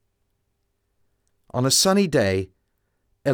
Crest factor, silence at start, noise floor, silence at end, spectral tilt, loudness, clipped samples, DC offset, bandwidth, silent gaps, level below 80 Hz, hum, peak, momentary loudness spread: 18 dB; 1.55 s; -73 dBFS; 0 s; -3.5 dB/octave; -20 LUFS; under 0.1%; under 0.1%; over 20 kHz; none; -56 dBFS; none; -6 dBFS; 14 LU